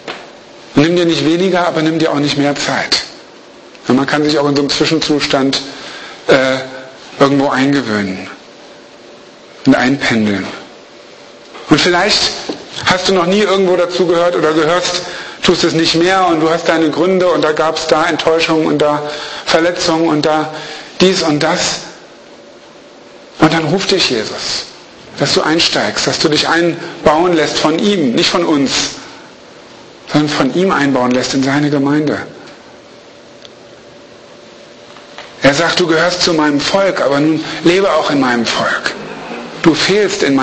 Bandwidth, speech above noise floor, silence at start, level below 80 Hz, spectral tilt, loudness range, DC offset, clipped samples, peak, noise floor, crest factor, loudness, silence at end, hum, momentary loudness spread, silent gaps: 8.8 kHz; 26 dB; 0 s; -46 dBFS; -4 dB/octave; 4 LU; under 0.1%; under 0.1%; 0 dBFS; -38 dBFS; 14 dB; -12 LUFS; 0 s; none; 13 LU; none